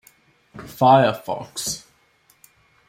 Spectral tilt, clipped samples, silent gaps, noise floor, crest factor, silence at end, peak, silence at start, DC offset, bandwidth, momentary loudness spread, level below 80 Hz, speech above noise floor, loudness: -4.5 dB/octave; under 0.1%; none; -60 dBFS; 20 dB; 1.1 s; -4 dBFS; 0.55 s; under 0.1%; 16.5 kHz; 22 LU; -60 dBFS; 41 dB; -19 LUFS